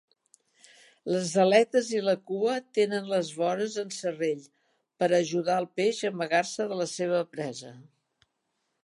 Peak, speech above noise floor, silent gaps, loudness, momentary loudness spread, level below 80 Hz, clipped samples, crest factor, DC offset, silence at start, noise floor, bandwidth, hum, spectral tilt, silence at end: -6 dBFS; 52 dB; none; -28 LUFS; 11 LU; -84 dBFS; under 0.1%; 22 dB; under 0.1%; 1.05 s; -79 dBFS; 11.5 kHz; none; -4.5 dB/octave; 1.05 s